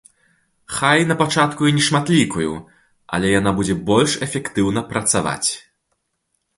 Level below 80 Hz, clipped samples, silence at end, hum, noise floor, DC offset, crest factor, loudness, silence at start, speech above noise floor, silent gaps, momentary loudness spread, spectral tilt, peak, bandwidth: -46 dBFS; under 0.1%; 1 s; none; -72 dBFS; under 0.1%; 18 dB; -18 LUFS; 0.7 s; 54 dB; none; 9 LU; -4 dB/octave; -2 dBFS; 11.5 kHz